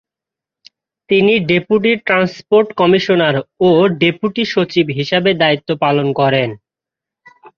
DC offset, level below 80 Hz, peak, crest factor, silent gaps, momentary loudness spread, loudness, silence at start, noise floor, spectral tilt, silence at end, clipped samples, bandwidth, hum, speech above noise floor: under 0.1%; -54 dBFS; 0 dBFS; 14 dB; none; 5 LU; -14 LUFS; 1.1 s; -86 dBFS; -7 dB/octave; 0.1 s; under 0.1%; 6.8 kHz; none; 72 dB